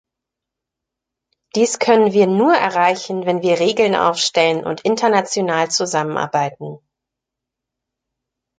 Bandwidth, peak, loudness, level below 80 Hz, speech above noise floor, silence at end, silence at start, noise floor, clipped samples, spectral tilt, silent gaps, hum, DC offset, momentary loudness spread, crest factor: 9.4 kHz; -2 dBFS; -16 LUFS; -64 dBFS; 67 dB; 1.85 s; 1.55 s; -83 dBFS; under 0.1%; -4 dB/octave; none; none; under 0.1%; 7 LU; 18 dB